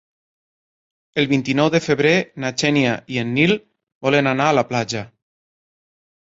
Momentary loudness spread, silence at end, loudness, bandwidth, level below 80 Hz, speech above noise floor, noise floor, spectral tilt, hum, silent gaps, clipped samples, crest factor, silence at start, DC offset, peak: 9 LU; 1.25 s; -19 LUFS; 8 kHz; -58 dBFS; over 72 dB; under -90 dBFS; -5 dB/octave; none; 3.95-4.01 s; under 0.1%; 18 dB; 1.15 s; under 0.1%; -2 dBFS